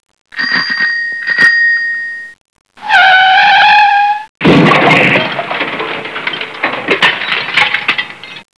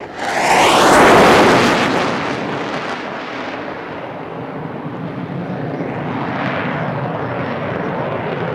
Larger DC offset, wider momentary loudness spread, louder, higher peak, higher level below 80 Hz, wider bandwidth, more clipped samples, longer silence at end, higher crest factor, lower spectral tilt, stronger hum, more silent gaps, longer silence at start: first, 0.3% vs under 0.1%; second, 13 LU vs 18 LU; first, -9 LUFS vs -15 LUFS; about the same, 0 dBFS vs -2 dBFS; about the same, -48 dBFS vs -46 dBFS; second, 11 kHz vs 16.5 kHz; first, 0.3% vs under 0.1%; first, 0.15 s vs 0 s; second, 10 dB vs 16 dB; about the same, -4.5 dB/octave vs -4.5 dB/octave; neither; first, 2.41-2.45 s, 2.61-2.65 s, 4.29-4.35 s vs none; first, 0.35 s vs 0 s